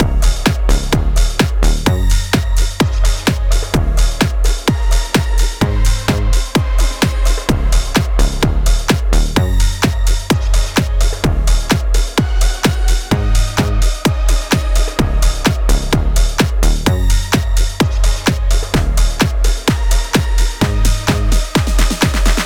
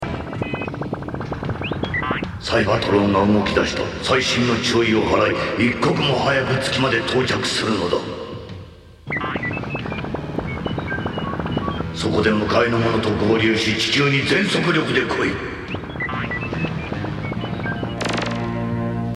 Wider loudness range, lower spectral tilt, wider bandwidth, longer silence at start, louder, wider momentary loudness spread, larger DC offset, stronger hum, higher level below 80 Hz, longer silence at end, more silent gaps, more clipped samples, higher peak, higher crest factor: second, 0 LU vs 7 LU; about the same, -4.5 dB/octave vs -5 dB/octave; first, 16.5 kHz vs 13 kHz; about the same, 0 s vs 0 s; first, -16 LUFS vs -20 LUFS; second, 2 LU vs 10 LU; neither; neither; first, -14 dBFS vs -40 dBFS; about the same, 0 s vs 0 s; neither; neither; about the same, -2 dBFS vs -2 dBFS; second, 12 dB vs 18 dB